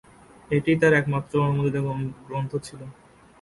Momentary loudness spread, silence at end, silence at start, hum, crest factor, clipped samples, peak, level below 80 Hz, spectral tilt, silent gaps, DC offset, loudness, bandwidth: 17 LU; 0.5 s; 0.5 s; none; 18 dB; under 0.1%; -8 dBFS; -56 dBFS; -7.5 dB/octave; none; under 0.1%; -24 LUFS; 11.5 kHz